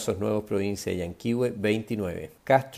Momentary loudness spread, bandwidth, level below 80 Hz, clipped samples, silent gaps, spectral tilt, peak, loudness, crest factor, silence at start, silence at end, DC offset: 7 LU; 16 kHz; -60 dBFS; under 0.1%; none; -6 dB/octave; -8 dBFS; -28 LUFS; 20 dB; 0 s; 0 s; under 0.1%